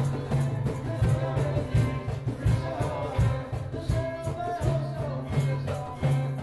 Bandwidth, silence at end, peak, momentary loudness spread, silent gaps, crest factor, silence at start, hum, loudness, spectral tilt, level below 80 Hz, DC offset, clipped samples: 12 kHz; 0 s; -14 dBFS; 6 LU; none; 14 dB; 0 s; none; -29 LUFS; -7.5 dB/octave; -38 dBFS; under 0.1%; under 0.1%